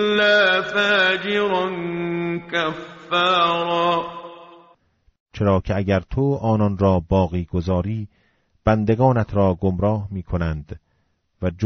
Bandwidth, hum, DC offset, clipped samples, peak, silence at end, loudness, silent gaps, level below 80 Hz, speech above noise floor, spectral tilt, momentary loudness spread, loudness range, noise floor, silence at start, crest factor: 7.6 kHz; none; under 0.1%; under 0.1%; -4 dBFS; 0 s; -20 LUFS; 5.20-5.26 s; -40 dBFS; 47 dB; -4 dB/octave; 12 LU; 3 LU; -67 dBFS; 0 s; 16 dB